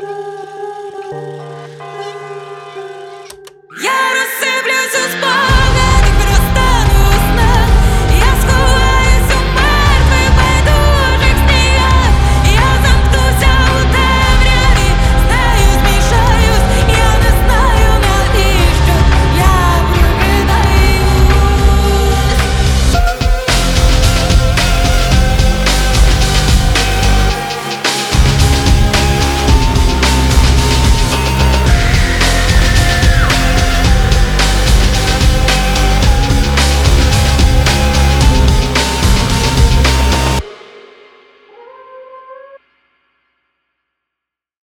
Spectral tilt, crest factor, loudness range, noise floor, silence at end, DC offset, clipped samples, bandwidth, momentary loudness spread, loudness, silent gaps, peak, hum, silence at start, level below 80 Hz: -4.5 dB/octave; 10 dB; 4 LU; -81 dBFS; 2.15 s; under 0.1%; under 0.1%; 18 kHz; 5 LU; -11 LUFS; none; 0 dBFS; none; 0 s; -12 dBFS